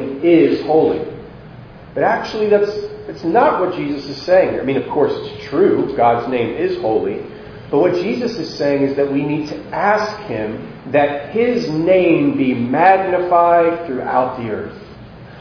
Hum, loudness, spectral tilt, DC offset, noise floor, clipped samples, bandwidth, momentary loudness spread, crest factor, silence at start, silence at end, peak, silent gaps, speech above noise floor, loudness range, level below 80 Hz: none; -16 LUFS; -7 dB/octave; under 0.1%; -37 dBFS; under 0.1%; 5.4 kHz; 13 LU; 16 dB; 0 s; 0 s; 0 dBFS; none; 21 dB; 4 LU; -48 dBFS